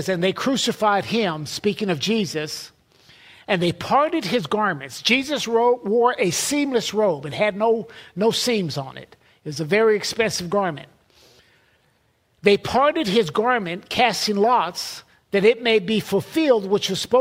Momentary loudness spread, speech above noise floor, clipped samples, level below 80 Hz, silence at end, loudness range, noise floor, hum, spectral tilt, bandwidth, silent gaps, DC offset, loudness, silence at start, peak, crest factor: 10 LU; 43 dB; under 0.1%; -58 dBFS; 0 s; 3 LU; -64 dBFS; none; -4 dB/octave; 16 kHz; none; under 0.1%; -21 LUFS; 0 s; -2 dBFS; 20 dB